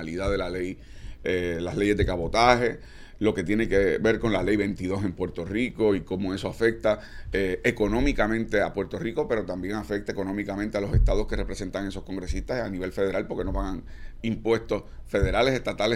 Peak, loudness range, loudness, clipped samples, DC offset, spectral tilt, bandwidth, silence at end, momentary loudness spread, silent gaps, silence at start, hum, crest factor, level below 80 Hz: -4 dBFS; 5 LU; -27 LUFS; under 0.1%; under 0.1%; -6 dB/octave; 14 kHz; 0 s; 9 LU; none; 0 s; none; 22 dB; -34 dBFS